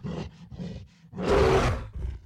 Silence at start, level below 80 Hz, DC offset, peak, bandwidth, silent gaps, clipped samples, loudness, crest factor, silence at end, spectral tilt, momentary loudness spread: 0 s; -36 dBFS; under 0.1%; -12 dBFS; 14 kHz; none; under 0.1%; -25 LUFS; 16 dB; 0.05 s; -6.5 dB/octave; 20 LU